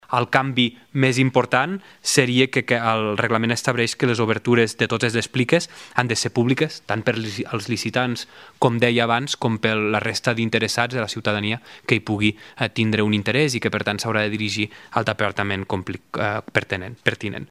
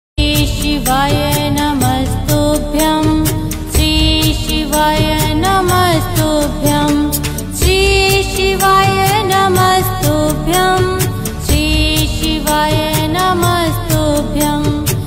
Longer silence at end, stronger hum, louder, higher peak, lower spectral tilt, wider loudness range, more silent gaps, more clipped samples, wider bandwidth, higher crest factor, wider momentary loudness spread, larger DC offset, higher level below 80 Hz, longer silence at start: about the same, 0.05 s vs 0 s; neither; second, -21 LUFS vs -13 LUFS; about the same, 0 dBFS vs 0 dBFS; about the same, -4.5 dB/octave vs -4.5 dB/octave; about the same, 3 LU vs 2 LU; neither; neither; about the same, 15 kHz vs 16.5 kHz; first, 22 dB vs 12 dB; about the same, 7 LU vs 5 LU; neither; second, -60 dBFS vs -22 dBFS; about the same, 0.1 s vs 0.15 s